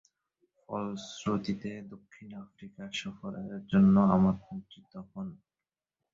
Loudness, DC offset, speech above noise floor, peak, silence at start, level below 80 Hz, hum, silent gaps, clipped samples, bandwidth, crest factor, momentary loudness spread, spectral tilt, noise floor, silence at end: -30 LUFS; under 0.1%; over 59 dB; -12 dBFS; 0.7 s; -60 dBFS; none; none; under 0.1%; 7.6 kHz; 20 dB; 25 LU; -7.5 dB/octave; under -90 dBFS; 0.8 s